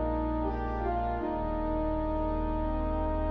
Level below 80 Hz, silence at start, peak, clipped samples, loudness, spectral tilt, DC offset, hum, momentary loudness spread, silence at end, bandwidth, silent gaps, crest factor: -34 dBFS; 0 s; -18 dBFS; under 0.1%; -32 LUFS; -8 dB/octave; under 0.1%; none; 1 LU; 0 s; 5 kHz; none; 12 dB